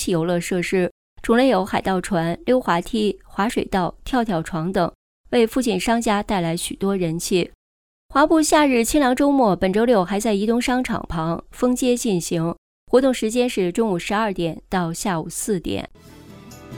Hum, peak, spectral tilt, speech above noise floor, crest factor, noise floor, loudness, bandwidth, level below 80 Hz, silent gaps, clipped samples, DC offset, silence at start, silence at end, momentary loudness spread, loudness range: none; -4 dBFS; -5 dB/octave; 22 dB; 18 dB; -41 dBFS; -21 LUFS; 19.5 kHz; -44 dBFS; 0.91-1.16 s, 4.95-5.24 s, 7.55-8.09 s, 12.58-12.87 s; under 0.1%; under 0.1%; 0 s; 0 s; 8 LU; 4 LU